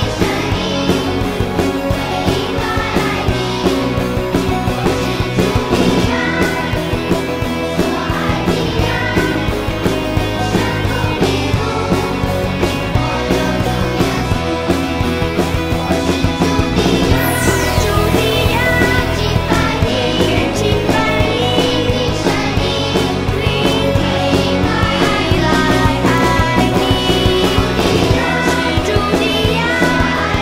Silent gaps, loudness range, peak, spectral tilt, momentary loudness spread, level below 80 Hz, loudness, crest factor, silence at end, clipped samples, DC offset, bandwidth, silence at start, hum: none; 3 LU; 0 dBFS; -5.5 dB/octave; 4 LU; -26 dBFS; -15 LUFS; 14 dB; 0 s; under 0.1%; under 0.1%; 16.5 kHz; 0 s; none